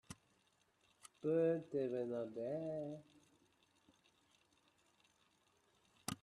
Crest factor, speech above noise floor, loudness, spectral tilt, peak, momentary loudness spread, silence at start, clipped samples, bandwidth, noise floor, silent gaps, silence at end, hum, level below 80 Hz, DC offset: 20 dB; 37 dB; -42 LUFS; -6 dB/octave; -26 dBFS; 17 LU; 0.1 s; under 0.1%; 13 kHz; -78 dBFS; none; 0.1 s; none; -82 dBFS; under 0.1%